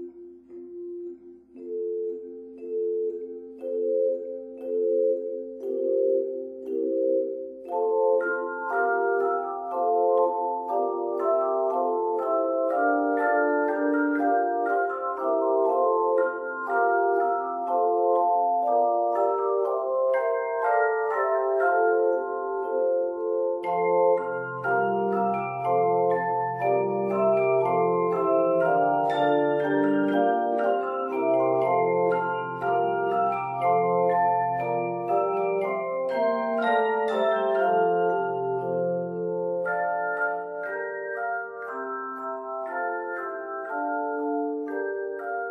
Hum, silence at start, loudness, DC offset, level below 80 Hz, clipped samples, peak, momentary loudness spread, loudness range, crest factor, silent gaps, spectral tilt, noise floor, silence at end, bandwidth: none; 0 s; -25 LUFS; under 0.1%; -74 dBFS; under 0.1%; -10 dBFS; 10 LU; 7 LU; 14 dB; none; -8.5 dB/octave; -46 dBFS; 0 s; 4.5 kHz